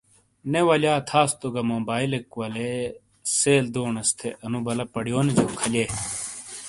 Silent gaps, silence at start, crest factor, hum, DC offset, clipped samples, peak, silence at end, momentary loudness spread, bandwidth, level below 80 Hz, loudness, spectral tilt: none; 0.45 s; 20 dB; none; under 0.1%; under 0.1%; -6 dBFS; 0 s; 11 LU; 11.5 kHz; -56 dBFS; -24 LUFS; -4 dB/octave